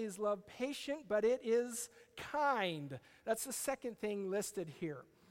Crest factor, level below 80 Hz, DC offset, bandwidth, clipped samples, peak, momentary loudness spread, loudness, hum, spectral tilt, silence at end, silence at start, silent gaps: 18 dB; -74 dBFS; under 0.1%; 16.5 kHz; under 0.1%; -22 dBFS; 12 LU; -39 LUFS; none; -3.5 dB/octave; 0.25 s; 0 s; none